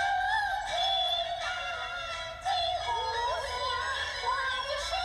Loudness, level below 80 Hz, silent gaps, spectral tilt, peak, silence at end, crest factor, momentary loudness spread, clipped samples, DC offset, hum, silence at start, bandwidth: -30 LUFS; -52 dBFS; none; -0.5 dB/octave; -18 dBFS; 0 s; 12 dB; 7 LU; under 0.1%; under 0.1%; none; 0 s; 14.5 kHz